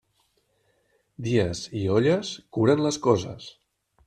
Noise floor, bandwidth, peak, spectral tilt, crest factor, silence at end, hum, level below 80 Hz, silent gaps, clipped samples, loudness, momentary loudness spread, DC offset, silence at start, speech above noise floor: -69 dBFS; 11.5 kHz; -6 dBFS; -6 dB/octave; 20 dB; 0.55 s; none; -58 dBFS; none; under 0.1%; -24 LUFS; 15 LU; under 0.1%; 1.2 s; 46 dB